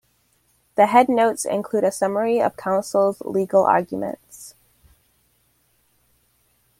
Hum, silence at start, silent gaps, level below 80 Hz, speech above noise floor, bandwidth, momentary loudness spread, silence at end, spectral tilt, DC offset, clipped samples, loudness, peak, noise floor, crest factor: none; 0.75 s; none; -64 dBFS; 45 dB; 16 kHz; 15 LU; 2.3 s; -5 dB/octave; under 0.1%; under 0.1%; -20 LUFS; -2 dBFS; -64 dBFS; 20 dB